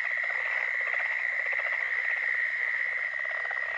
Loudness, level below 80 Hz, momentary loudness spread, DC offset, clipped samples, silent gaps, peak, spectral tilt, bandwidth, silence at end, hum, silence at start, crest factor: -28 LUFS; -74 dBFS; 3 LU; under 0.1%; under 0.1%; none; -16 dBFS; -0.5 dB/octave; 8.6 kHz; 0 s; none; 0 s; 12 dB